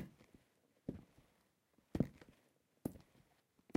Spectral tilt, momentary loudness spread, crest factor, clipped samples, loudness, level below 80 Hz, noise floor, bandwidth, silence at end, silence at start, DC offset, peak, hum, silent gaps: -8 dB/octave; 23 LU; 28 dB; under 0.1%; -47 LUFS; -66 dBFS; -78 dBFS; 16 kHz; 0.8 s; 0 s; under 0.1%; -20 dBFS; none; none